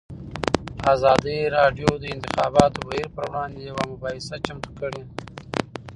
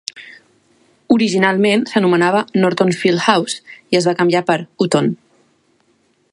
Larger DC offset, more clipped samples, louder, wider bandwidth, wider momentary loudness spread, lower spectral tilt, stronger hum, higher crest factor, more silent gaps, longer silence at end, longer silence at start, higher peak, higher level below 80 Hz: neither; neither; second, -23 LUFS vs -15 LUFS; about the same, 11 kHz vs 11.5 kHz; first, 13 LU vs 7 LU; about the same, -5.5 dB/octave vs -5 dB/octave; neither; first, 24 dB vs 16 dB; neither; second, 0 s vs 1.2 s; about the same, 0.1 s vs 0.15 s; about the same, 0 dBFS vs 0 dBFS; first, -44 dBFS vs -62 dBFS